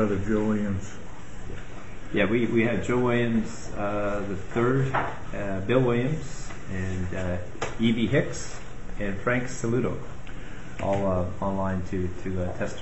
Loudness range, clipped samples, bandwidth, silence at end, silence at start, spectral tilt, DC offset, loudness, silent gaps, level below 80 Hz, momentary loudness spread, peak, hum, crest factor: 3 LU; under 0.1%; 8.2 kHz; 0 s; 0 s; -6.5 dB/octave; 2%; -27 LUFS; none; -40 dBFS; 17 LU; -8 dBFS; none; 20 dB